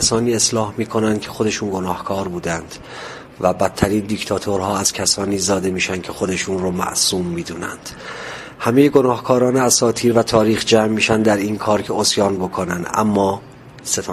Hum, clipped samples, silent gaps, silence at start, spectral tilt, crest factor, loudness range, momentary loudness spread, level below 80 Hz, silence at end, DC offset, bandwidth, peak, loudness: none; under 0.1%; none; 0 s; -4 dB/octave; 18 dB; 6 LU; 14 LU; -44 dBFS; 0 s; under 0.1%; 15 kHz; 0 dBFS; -18 LUFS